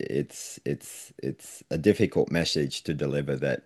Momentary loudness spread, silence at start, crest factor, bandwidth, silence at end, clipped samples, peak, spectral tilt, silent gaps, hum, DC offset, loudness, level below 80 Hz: 12 LU; 0 s; 22 dB; 12.5 kHz; 0.05 s; under 0.1%; -6 dBFS; -5.5 dB/octave; none; none; under 0.1%; -28 LUFS; -56 dBFS